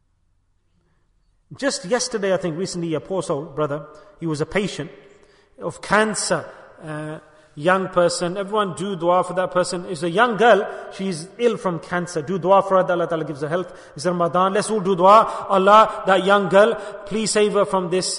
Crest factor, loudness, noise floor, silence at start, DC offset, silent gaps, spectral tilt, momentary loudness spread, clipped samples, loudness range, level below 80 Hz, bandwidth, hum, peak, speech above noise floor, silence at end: 18 dB; -19 LUFS; -64 dBFS; 1.5 s; under 0.1%; none; -4.5 dB/octave; 16 LU; under 0.1%; 9 LU; -56 dBFS; 11 kHz; none; -2 dBFS; 44 dB; 0 s